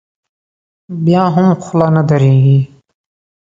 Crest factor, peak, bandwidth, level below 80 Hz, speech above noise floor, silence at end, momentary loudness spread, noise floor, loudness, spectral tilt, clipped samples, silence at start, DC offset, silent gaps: 12 dB; 0 dBFS; 7.4 kHz; -50 dBFS; over 80 dB; 0.75 s; 8 LU; under -90 dBFS; -11 LUFS; -9 dB/octave; under 0.1%; 0.9 s; under 0.1%; none